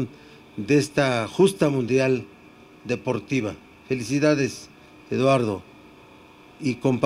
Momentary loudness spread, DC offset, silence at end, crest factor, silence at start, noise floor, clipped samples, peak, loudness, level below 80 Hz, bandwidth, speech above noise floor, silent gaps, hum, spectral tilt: 15 LU; under 0.1%; 0 s; 18 dB; 0 s; -49 dBFS; under 0.1%; -6 dBFS; -23 LUFS; -60 dBFS; 13.5 kHz; 27 dB; none; none; -6 dB/octave